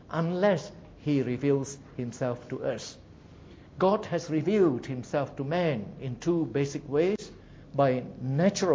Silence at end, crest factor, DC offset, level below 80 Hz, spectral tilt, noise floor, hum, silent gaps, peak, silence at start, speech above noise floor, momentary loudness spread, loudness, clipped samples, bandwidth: 0 s; 18 dB; under 0.1%; -58 dBFS; -6.5 dB/octave; -50 dBFS; none; none; -10 dBFS; 0.1 s; 22 dB; 12 LU; -29 LUFS; under 0.1%; 8 kHz